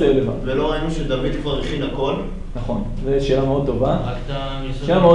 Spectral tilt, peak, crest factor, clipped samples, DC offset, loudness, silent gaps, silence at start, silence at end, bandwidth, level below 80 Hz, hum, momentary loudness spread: -7.5 dB/octave; -2 dBFS; 16 dB; under 0.1%; under 0.1%; -21 LUFS; none; 0 s; 0 s; 10 kHz; -28 dBFS; none; 8 LU